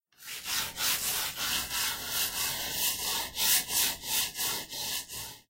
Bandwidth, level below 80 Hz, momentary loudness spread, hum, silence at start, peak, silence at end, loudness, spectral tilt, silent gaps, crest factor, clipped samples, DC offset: 16 kHz; -58 dBFS; 8 LU; none; 0.2 s; -10 dBFS; 0.1 s; -29 LUFS; 1 dB/octave; none; 22 dB; under 0.1%; under 0.1%